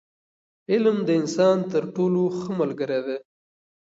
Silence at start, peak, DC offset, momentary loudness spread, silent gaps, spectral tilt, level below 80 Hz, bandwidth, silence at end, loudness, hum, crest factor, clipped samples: 0.7 s; -8 dBFS; under 0.1%; 7 LU; none; -6.5 dB/octave; -72 dBFS; 8 kHz; 0.8 s; -23 LUFS; none; 16 dB; under 0.1%